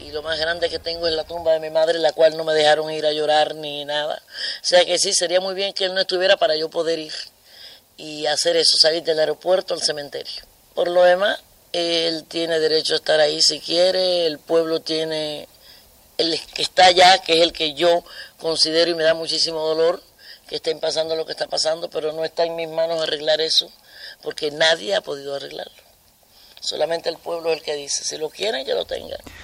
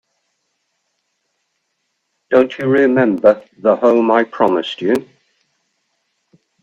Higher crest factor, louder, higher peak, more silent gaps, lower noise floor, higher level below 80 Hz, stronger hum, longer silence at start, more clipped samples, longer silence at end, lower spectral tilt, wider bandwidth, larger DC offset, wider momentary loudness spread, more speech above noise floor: about the same, 20 dB vs 18 dB; second, -19 LUFS vs -15 LUFS; about the same, -2 dBFS vs 0 dBFS; neither; second, -54 dBFS vs -70 dBFS; about the same, -58 dBFS vs -62 dBFS; neither; second, 0 s vs 2.3 s; neither; second, 0 s vs 1.6 s; second, -1.5 dB/octave vs -7 dB/octave; first, 16 kHz vs 10 kHz; neither; first, 14 LU vs 6 LU; second, 34 dB vs 57 dB